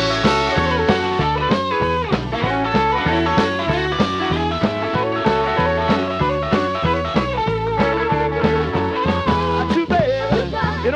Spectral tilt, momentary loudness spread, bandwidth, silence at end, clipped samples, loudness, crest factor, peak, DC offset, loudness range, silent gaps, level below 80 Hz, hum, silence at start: -6.5 dB/octave; 3 LU; 10 kHz; 0 s; under 0.1%; -18 LUFS; 18 dB; -2 dBFS; under 0.1%; 1 LU; none; -34 dBFS; none; 0 s